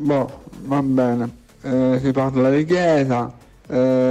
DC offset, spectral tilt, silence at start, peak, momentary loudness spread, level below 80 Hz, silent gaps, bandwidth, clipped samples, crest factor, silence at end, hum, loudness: under 0.1%; -8 dB/octave; 0 s; -6 dBFS; 12 LU; -50 dBFS; none; 8.6 kHz; under 0.1%; 12 dB; 0 s; none; -19 LUFS